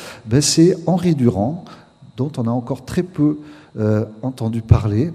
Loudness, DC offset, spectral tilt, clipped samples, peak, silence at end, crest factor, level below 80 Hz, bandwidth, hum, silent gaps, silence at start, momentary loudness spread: -18 LUFS; under 0.1%; -6 dB/octave; under 0.1%; 0 dBFS; 0 s; 18 dB; -38 dBFS; 14.5 kHz; none; none; 0 s; 11 LU